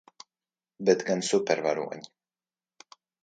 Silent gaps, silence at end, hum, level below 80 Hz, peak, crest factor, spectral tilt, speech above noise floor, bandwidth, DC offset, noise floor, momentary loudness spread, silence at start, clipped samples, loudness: none; 1.15 s; none; -78 dBFS; -8 dBFS; 22 dB; -4 dB/octave; over 63 dB; 9.6 kHz; under 0.1%; under -90 dBFS; 11 LU; 0.8 s; under 0.1%; -27 LUFS